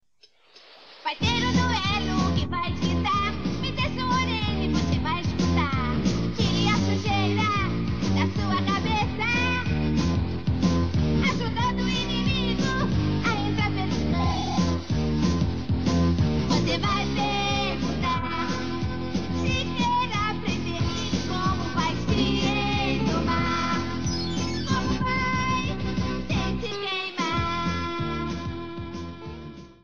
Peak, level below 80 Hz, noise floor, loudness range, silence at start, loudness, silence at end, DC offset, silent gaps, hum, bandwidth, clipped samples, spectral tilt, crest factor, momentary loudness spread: -10 dBFS; -38 dBFS; -60 dBFS; 2 LU; 0 s; -25 LUFS; 0 s; 1%; none; none; 7.4 kHz; under 0.1%; -5.5 dB/octave; 16 dB; 5 LU